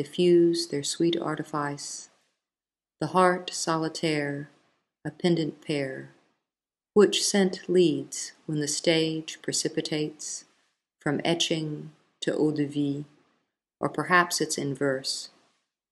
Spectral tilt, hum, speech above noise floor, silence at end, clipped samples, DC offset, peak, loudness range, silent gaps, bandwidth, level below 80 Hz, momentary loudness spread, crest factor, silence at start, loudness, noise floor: -4 dB/octave; none; over 64 dB; 0.65 s; under 0.1%; under 0.1%; -4 dBFS; 4 LU; none; 12.5 kHz; -74 dBFS; 14 LU; 22 dB; 0 s; -27 LUFS; under -90 dBFS